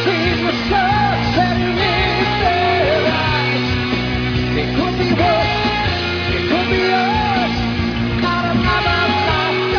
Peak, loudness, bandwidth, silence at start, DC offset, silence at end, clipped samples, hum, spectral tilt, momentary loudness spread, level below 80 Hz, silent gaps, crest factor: -4 dBFS; -16 LUFS; 5.4 kHz; 0 s; under 0.1%; 0 s; under 0.1%; none; -6 dB/octave; 4 LU; -30 dBFS; none; 14 dB